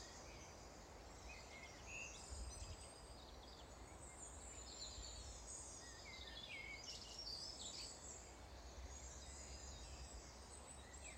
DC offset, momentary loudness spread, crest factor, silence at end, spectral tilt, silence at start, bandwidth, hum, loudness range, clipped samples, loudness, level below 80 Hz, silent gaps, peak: under 0.1%; 8 LU; 16 dB; 0 s; -2 dB/octave; 0 s; 16 kHz; none; 4 LU; under 0.1%; -54 LUFS; -60 dBFS; none; -40 dBFS